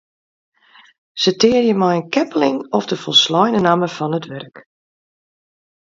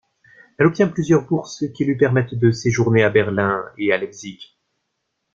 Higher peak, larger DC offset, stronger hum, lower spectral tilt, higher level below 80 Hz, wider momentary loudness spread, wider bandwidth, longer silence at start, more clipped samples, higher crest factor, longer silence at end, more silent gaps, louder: about the same, 0 dBFS vs -2 dBFS; neither; neither; second, -4.5 dB/octave vs -6.5 dB/octave; second, -60 dBFS vs -54 dBFS; about the same, 11 LU vs 9 LU; about the same, 7.8 kHz vs 7.6 kHz; first, 1.15 s vs 0.6 s; neither; about the same, 18 dB vs 18 dB; first, 1.4 s vs 0.9 s; neither; first, -16 LUFS vs -19 LUFS